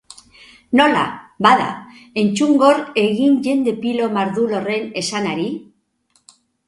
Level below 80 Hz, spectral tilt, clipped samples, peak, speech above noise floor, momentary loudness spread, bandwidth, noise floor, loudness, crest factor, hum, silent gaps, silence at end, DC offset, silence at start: -60 dBFS; -5 dB/octave; under 0.1%; 0 dBFS; 46 dB; 11 LU; 11.5 kHz; -62 dBFS; -17 LUFS; 18 dB; none; none; 1.05 s; under 0.1%; 0.7 s